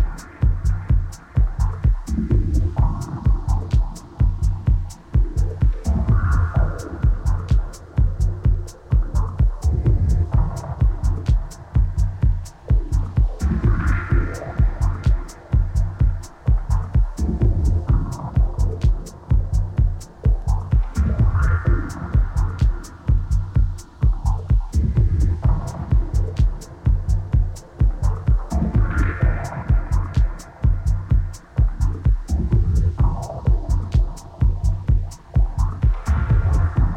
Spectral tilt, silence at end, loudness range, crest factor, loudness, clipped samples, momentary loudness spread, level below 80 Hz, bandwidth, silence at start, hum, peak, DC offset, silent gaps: -8 dB/octave; 0 s; 1 LU; 12 dB; -22 LUFS; under 0.1%; 4 LU; -20 dBFS; 9.2 kHz; 0 s; none; -6 dBFS; under 0.1%; none